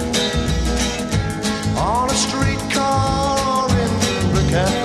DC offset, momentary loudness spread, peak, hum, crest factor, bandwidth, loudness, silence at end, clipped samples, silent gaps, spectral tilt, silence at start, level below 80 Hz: under 0.1%; 3 LU; -4 dBFS; none; 14 dB; 14 kHz; -18 LUFS; 0 s; under 0.1%; none; -4.5 dB/octave; 0 s; -28 dBFS